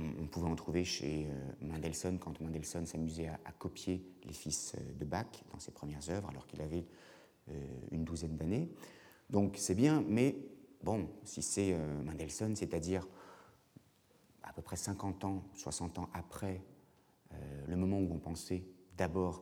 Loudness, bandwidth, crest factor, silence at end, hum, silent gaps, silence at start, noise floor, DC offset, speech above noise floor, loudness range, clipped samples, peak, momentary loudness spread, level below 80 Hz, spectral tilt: -39 LUFS; 19 kHz; 22 dB; 0 s; none; none; 0 s; -69 dBFS; under 0.1%; 30 dB; 8 LU; under 0.1%; -18 dBFS; 16 LU; -58 dBFS; -5.5 dB/octave